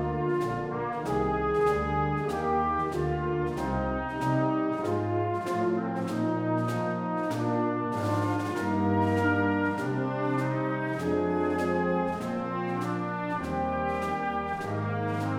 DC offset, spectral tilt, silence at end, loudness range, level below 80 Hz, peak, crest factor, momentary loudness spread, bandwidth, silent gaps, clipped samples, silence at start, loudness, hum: under 0.1%; -7.5 dB/octave; 0 s; 2 LU; -48 dBFS; -14 dBFS; 14 dB; 5 LU; 16 kHz; none; under 0.1%; 0 s; -29 LUFS; none